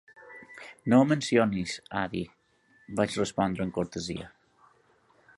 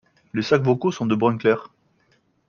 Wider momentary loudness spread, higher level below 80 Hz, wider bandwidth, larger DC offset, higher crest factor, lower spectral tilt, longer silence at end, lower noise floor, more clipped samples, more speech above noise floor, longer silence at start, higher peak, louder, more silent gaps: first, 23 LU vs 8 LU; about the same, -58 dBFS vs -62 dBFS; first, 11.5 kHz vs 7.2 kHz; neither; about the same, 22 dB vs 20 dB; second, -5.5 dB/octave vs -7 dB/octave; first, 1.1 s vs 0.8 s; about the same, -64 dBFS vs -64 dBFS; neither; second, 37 dB vs 44 dB; second, 0.2 s vs 0.35 s; second, -8 dBFS vs -4 dBFS; second, -28 LUFS vs -21 LUFS; neither